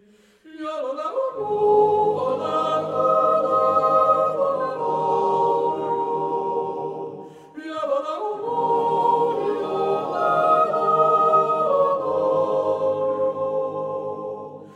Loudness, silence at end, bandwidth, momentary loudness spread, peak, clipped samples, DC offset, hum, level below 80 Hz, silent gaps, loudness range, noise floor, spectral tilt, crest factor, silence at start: -21 LUFS; 0 s; 10 kHz; 12 LU; -6 dBFS; under 0.1%; under 0.1%; none; -76 dBFS; none; 5 LU; -52 dBFS; -7 dB/octave; 16 dB; 0.45 s